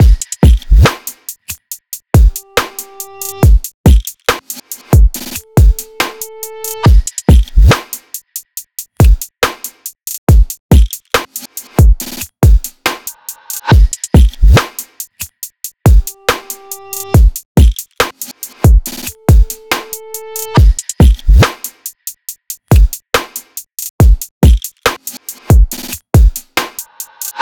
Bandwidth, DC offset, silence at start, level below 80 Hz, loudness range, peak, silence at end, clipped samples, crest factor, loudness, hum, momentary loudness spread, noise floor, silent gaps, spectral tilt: 19.5 kHz; under 0.1%; 0 s; -12 dBFS; 1 LU; 0 dBFS; 0 s; under 0.1%; 10 dB; -12 LUFS; none; 15 LU; -29 dBFS; 3.74-3.84 s, 10.18-10.27 s, 10.60-10.69 s, 17.45-17.55 s, 23.90-23.99 s, 24.31-24.41 s; -5 dB/octave